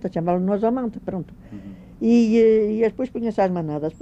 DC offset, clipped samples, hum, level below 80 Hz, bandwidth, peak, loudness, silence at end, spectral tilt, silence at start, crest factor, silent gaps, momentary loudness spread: under 0.1%; under 0.1%; none; -50 dBFS; 8 kHz; -8 dBFS; -21 LUFS; 0.05 s; -8.5 dB/octave; 0 s; 14 dB; none; 22 LU